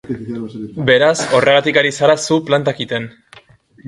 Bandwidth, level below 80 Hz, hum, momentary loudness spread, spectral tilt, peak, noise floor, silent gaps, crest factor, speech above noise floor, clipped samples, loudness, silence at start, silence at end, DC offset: 11.5 kHz; -54 dBFS; none; 14 LU; -4 dB/octave; 0 dBFS; -46 dBFS; none; 16 dB; 31 dB; under 0.1%; -14 LUFS; 0.05 s; 0 s; under 0.1%